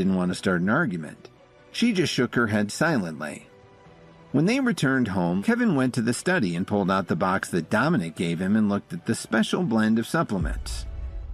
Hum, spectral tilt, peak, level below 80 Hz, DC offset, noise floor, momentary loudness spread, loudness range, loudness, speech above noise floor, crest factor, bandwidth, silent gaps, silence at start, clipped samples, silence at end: none; -5.5 dB/octave; -10 dBFS; -42 dBFS; under 0.1%; -51 dBFS; 11 LU; 2 LU; -24 LUFS; 27 dB; 16 dB; 14 kHz; none; 0 s; under 0.1%; 0 s